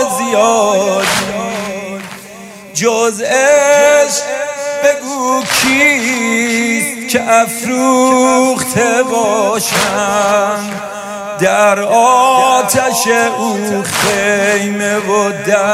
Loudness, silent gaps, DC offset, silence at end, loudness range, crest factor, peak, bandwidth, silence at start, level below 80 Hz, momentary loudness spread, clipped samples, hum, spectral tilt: -12 LUFS; none; under 0.1%; 0 s; 2 LU; 12 dB; 0 dBFS; 16 kHz; 0 s; -52 dBFS; 11 LU; under 0.1%; none; -3 dB/octave